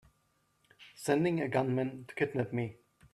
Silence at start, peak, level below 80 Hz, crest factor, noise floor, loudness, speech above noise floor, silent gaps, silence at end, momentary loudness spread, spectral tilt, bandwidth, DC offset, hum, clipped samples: 0.8 s; -14 dBFS; -72 dBFS; 20 dB; -74 dBFS; -33 LUFS; 42 dB; none; 0.4 s; 9 LU; -6.5 dB/octave; 13.5 kHz; under 0.1%; none; under 0.1%